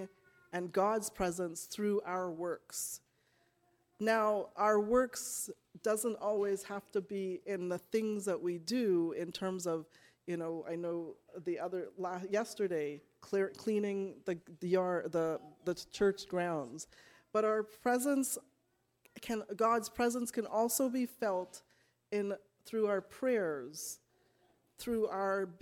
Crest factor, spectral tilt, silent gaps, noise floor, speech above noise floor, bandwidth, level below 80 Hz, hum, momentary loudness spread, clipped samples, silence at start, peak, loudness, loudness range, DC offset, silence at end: 18 dB; -4.5 dB/octave; none; -78 dBFS; 43 dB; 17.5 kHz; -70 dBFS; none; 10 LU; under 0.1%; 0 s; -18 dBFS; -36 LUFS; 4 LU; under 0.1%; 0.05 s